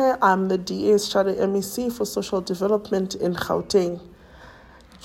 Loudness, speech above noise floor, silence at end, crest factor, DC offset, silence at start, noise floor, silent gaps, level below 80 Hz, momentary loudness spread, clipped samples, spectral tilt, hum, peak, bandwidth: -23 LUFS; 26 dB; 0.05 s; 18 dB; under 0.1%; 0 s; -48 dBFS; none; -54 dBFS; 7 LU; under 0.1%; -5 dB/octave; none; -4 dBFS; 16.5 kHz